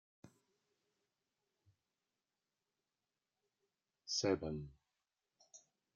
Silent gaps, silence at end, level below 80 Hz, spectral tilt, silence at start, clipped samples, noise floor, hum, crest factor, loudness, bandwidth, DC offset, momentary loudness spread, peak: none; 0.4 s; -72 dBFS; -4 dB/octave; 0.25 s; under 0.1%; under -90 dBFS; none; 26 dB; -40 LUFS; 7.4 kHz; under 0.1%; 26 LU; -22 dBFS